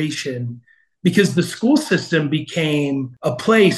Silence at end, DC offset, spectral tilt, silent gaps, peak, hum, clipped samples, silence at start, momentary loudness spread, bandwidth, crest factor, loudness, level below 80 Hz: 0 s; under 0.1%; -5.5 dB/octave; none; -2 dBFS; none; under 0.1%; 0 s; 9 LU; 12.5 kHz; 16 dB; -19 LUFS; -62 dBFS